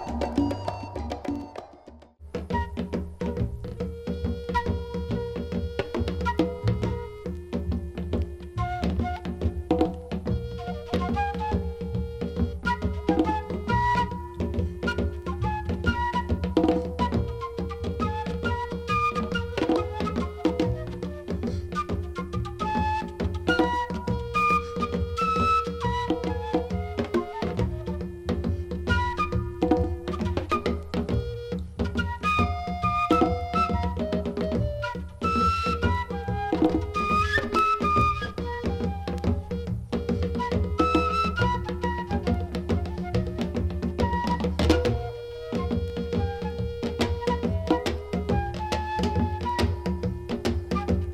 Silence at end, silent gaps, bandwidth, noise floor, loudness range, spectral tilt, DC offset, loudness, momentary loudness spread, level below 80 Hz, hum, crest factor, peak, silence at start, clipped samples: 0 s; none; 13 kHz; -49 dBFS; 4 LU; -7 dB/octave; under 0.1%; -28 LUFS; 9 LU; -36 dBFS; none; 20 dB; -6 dBFS; 0 s; under 0.1%